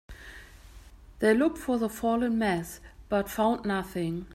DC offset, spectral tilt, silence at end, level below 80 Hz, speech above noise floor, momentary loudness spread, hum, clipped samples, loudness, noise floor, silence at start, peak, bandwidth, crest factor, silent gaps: under 0.1%; -6 dB/octave; 0 s; -52 dBFS; 22 dB; 21 LU; none; under 0.1%; -28 LUFS; -50 dBFS; 0.1 s; -12 dBFS; 16 kHz; 18 dB; none